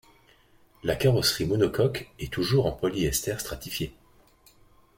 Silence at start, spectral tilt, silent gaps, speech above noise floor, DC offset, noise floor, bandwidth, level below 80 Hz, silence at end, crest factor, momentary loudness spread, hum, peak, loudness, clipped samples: 0.85 s; -5 dB/octave; none; 33 dB; under 0.1%; -59 dBFS; 17 kHz; -46 dBFS; 1.05 s; 18 dB; 11 LU; none; -10 dBFS; -27 LUFS; under 0.1%